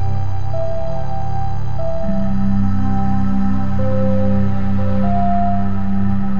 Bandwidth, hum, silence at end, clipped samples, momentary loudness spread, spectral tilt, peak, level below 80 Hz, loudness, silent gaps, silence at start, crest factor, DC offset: 6.8 kHz; 50 Hz at -40 dBFS; 0 s; under 0.1%; 6 LU; -10 dB/octave; -4 dBFS; -28 dBFS; -20 LUFS; none; 0 s; 12 dB; 20%